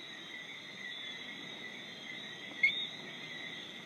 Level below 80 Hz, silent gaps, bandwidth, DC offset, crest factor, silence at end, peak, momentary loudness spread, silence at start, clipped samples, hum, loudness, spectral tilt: -88 dBFS; none; 15.5 kHz; under 0.1%; 24 dB; 0 s; -18 dBFS; 14 LU; 0 s; under 0.1%; none; -38 LUFS; -2 dB/octave